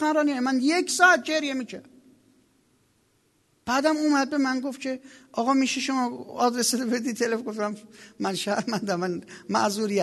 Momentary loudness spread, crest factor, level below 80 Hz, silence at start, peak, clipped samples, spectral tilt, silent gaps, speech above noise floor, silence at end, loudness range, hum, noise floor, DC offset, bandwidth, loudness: 11 LU; 22 dB; -72 dBFS; 0 s; -4 dBFS; under 0.1%; -3.5 dB/octave; none; 42 dB; 0 s; 3 LU; none; -67 dBFS; under 0.1%; 12.5 kHz; -25 LUFS